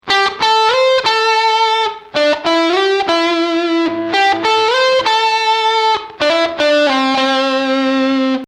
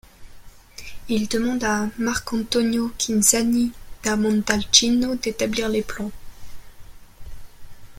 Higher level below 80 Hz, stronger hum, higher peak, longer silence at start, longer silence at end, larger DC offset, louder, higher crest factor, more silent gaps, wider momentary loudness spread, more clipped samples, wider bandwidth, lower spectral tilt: second, -56 dBFS vs -44 dBFS; neither; about the same, -2 dBFS vs 0 dBFS; second, 0.05 s vs 0.2 s; about the same, 0 s vs 0 s; neither; first, -13 LUFS vs -21 LUFS; second, 12 dB vs 22 dB; neither; second, 4 LU vs 14 LU; neither; second, 12.5 kHz vs 16.5 kHz; about the same, -2.5 dB/octave vs -2.5 dB/octave